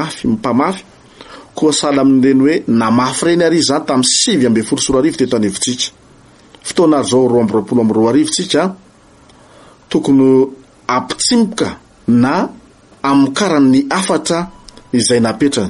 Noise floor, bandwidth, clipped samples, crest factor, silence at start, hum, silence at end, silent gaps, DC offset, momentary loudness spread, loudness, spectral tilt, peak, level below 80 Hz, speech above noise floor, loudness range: -44 dBFS; 11.5 kHz; under 0.1%; 14 dB; 0 s; none; 0 s; none; under 0.1%; 9 LU; -13 LUFS; -4 dB/octave; 0 dBFS; -48 dBFS; 32 dB; 3 LU